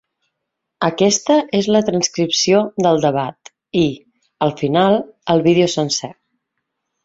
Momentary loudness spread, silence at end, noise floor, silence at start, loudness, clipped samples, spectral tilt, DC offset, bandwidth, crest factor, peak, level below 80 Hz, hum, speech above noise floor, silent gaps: 8 LU; 0.9 s; -77 dBFS; 0.8 s; -16 LUFS; under 0.1%; -4.5 dB/octave; under 0.1%; 8 kHz; 16 dB; -2 dBFS; -56 dBFS; none; 62 dB; none